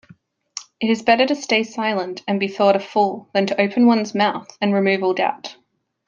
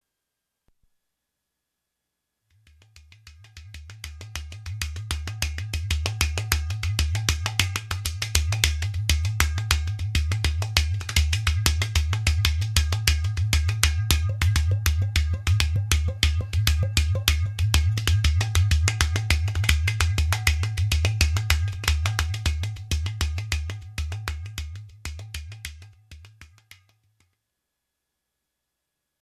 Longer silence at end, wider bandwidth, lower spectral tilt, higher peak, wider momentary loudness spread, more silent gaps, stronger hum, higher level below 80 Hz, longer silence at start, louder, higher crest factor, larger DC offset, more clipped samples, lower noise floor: second, 0.55 s vs 2.85 s; second, 7.6 kHz vs 14 kHz; first, -5 dB/octave vs -3 dB/octave; about the same, -2 dBFS vs 0 dBFS; second, 9 LU vs 13 LU; neither; neither; second, -68 dBFS vs -30 dBFS; second, 0.55 s vs 2.95 s; first, -19 LUFS vs -24 LUFS; second, 18 dB vs 24 dB; neither; neither; second, -51 dBFS vs -82 dBFS